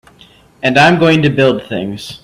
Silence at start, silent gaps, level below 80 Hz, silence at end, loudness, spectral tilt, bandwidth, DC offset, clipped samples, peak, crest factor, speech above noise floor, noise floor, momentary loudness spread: 0.65 s; none; -46 dBFS; 0.05 s; -11 LUFS; -6 dB/octave; 13.5 kHz; under 0.1%; under 0.1%; 0 dBFS; 12 dB; 33 dB; -44 dBFS; 13 LU